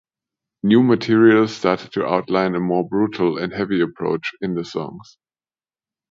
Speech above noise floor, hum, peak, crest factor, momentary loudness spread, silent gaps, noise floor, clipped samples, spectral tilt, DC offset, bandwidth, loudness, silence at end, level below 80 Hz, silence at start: over 72 dB; none; 0 dBFS; 18 dB; 11 LU; none; under -90 dBFS; under 0.1%; -7 dB/octave; under 0.1%; 7.4 kHz; -19 LUFS; 1.1 s; -58 dBFS; 0.65 s